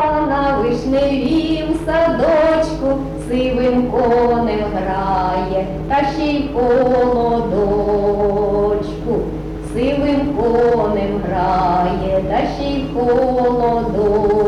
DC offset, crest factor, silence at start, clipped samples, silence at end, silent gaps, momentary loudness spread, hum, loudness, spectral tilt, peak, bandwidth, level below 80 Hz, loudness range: under 0.1%; 10 dB; 0 s; under 0.1%; 0 s; none; 6 LU; none; -16 LUFS; -7.5 dB/octave; -6 dBFS; 11.5 kHz; -30 dBFS; 1 LU